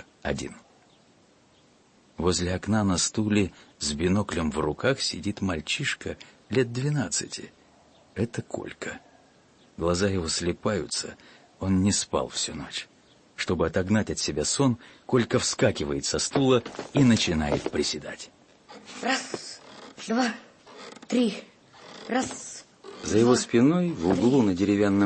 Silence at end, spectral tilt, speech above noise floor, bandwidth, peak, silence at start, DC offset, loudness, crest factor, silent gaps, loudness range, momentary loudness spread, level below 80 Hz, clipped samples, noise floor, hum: 0 s; -4.5 dB/octave; 34 dB; 8.8 kHz; -10 dBFS; 0.25 s; under 0.1%; -26 LUFS; 18 dB; none; 6 LU; 18 LU; -50 dBFS; under 0.1%; -60 dBFS; none